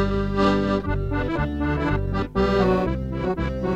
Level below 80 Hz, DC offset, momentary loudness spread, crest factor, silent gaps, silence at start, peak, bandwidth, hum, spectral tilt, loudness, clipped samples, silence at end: -30 dBFS; under 0.1%; 6 LU; 16 dB; none; 0 s; -6 dBFS; 8.4 kHz; none; -8 dB/octave; -23 LUFS; under 0.1%; 0 s